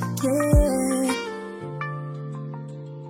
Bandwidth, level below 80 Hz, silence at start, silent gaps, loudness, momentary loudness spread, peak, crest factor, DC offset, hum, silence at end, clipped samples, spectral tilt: 16.5 kHz; -30 dBFS; 0 s; none; -25 LUFS; 15 LU; -6 dBFS; 18 dB; under 0.1%; none; 0 s; under 0.1%; -6 dB/octave